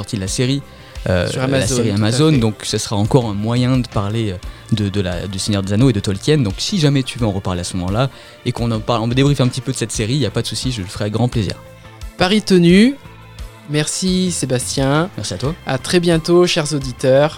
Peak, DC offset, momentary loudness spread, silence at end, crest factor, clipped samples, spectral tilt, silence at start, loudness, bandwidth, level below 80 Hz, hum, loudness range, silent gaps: 0 dBFS; under 0.1%; 9 LU; 0 s; 16 dB; under 0.1%; -5.5 dB/octave; 0 s; -17 LUFS; 16.5 kHz; -36 dBFS; none; 2 LU; none